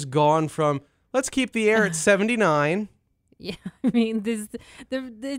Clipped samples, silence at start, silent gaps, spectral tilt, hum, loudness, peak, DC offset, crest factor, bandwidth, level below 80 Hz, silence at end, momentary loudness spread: under 0.1%; 0 s; none; -5 dB/octave; none; -23 LUFS; -6 dBFS; under 0.1%; 18 dB; 16 kHz; -60 dBFS; 0 s; 16 LU